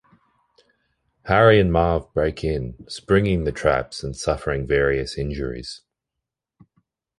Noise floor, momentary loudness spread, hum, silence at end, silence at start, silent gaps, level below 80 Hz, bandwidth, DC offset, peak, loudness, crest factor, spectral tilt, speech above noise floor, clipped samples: -84 dBFS; 17 LU; none; 1.4 s; 1.25 s; none; -36 dBFS; 11.5 kHz; under 0.1%; -2 dBFS; -21 LUFS; 20 dB; -6 dB/octave; 64 dB; under 0.1%